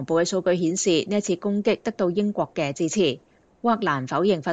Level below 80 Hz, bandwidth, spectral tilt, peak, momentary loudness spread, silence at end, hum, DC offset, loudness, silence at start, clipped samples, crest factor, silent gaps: -64 dBFS; 9.2 kHz; -4.5 dB/octave; -8 dBFS; 4 LU; 0 s; none; under 0.1%; -23 LUFS; 0 s; under 0.1%; 16 dB; none